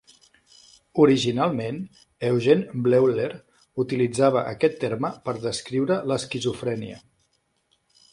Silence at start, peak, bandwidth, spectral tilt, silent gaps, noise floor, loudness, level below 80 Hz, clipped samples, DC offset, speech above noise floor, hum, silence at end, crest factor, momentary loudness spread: 0.95 s; -4 dBFS; 11.5 kHz; -6 dB/octave; none; -70 dBFS; -23 LUFS; -62 dBFS; under 0.1%; under 0.1%; 47 dB; none; 1.15 s; 20 dB; 12 LU